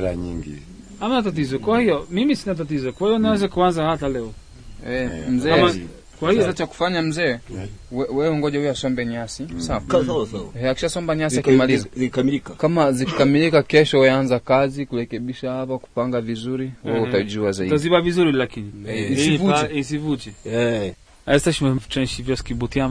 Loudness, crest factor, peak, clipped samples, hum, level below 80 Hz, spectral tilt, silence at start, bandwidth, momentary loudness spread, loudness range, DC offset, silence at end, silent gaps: -21 LUFS; 18 dB; -2 dBFS; under 0.1%; none; -42 dBFS; -5.5 dB/octave; 0 s; 11 kHz; 12 LU; 5 LU; under 0.1%; 0 s; none